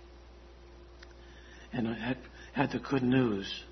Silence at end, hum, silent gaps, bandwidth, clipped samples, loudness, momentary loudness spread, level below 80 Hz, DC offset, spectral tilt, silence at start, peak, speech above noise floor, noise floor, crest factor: 0 s; none; none; 6.4 kHz; under 0.1%; -32 LUFS; 26 LU; -54 dBFS; under 0.1%; -7 dB/octave; 0 s; -12 dBFS; 21 dB; -53 dBFS; 24 dB